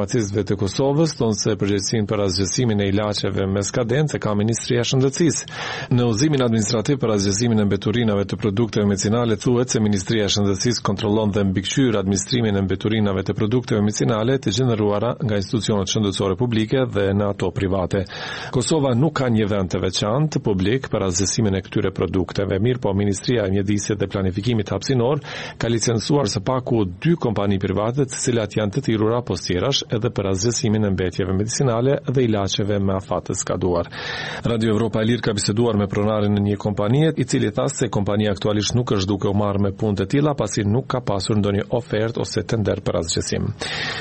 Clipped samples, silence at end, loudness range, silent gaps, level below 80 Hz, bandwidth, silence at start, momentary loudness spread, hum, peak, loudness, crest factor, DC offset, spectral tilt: under 0.1%; 0 s; 2 LU; none; -46 dBFS; 8.8 kHz; 0 s; 4 LU; none; -6 dBFS; -21 LUFS; 14 dB; 0.1%; -5.5 dB/octave